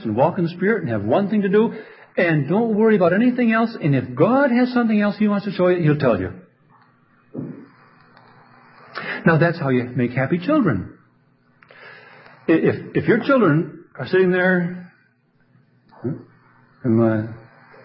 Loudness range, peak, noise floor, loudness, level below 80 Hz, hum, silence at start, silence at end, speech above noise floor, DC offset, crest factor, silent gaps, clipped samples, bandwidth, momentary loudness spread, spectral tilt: 6 LU; -2 dBFS; -60 dBFS; -19 LUFS; -54 dBFS; none; 0 s; 0.45 s; 42 dB; under 0.1%; 18 dB; none; under 0.1%; 5.8 kHz; 15 LU; -12.5 dB/octave